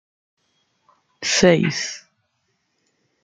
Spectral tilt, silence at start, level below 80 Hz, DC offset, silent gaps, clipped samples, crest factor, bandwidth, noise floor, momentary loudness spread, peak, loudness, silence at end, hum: -4 dB/octave; 1.2 s; -56 dBFS; under 0.1%; none; under 0.1%; 22 dB; 9.6 kHz; -71 dBFS; 14 LU; -2 dBFS; -18 LUFS; 1.25 s; none